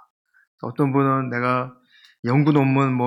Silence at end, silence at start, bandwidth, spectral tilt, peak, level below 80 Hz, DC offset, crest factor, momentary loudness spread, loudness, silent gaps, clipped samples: 0 s; 0.65 s; 9.4 kHz; -9 dB/octave; -4 dBFS; -70 dBFS; under 0.1%; 16 dB; 15 LU; -20 LUFS; 2.19-2.23 s; under 0.1%